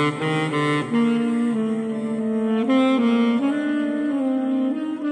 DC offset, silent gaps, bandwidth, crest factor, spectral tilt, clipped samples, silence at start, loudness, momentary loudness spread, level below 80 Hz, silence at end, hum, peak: under 0.1%; none; 10 kHz; 12 dB; -6.5 dB/octave; under 0.1%; 0 s; -21 LUFS; 6 LU; -68 dBFS; 0 s; none; -10 dBFS